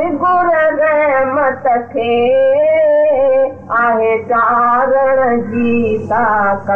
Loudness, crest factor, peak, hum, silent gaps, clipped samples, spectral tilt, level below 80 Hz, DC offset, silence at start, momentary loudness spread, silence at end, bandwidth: -12 LUFS; 8 dB; -6 dBFS; none; none; under 0.1%; -8 dB/octave; -50 dBFS; 1%; 0 s; 4 LU; 0 s; 3.9 kHz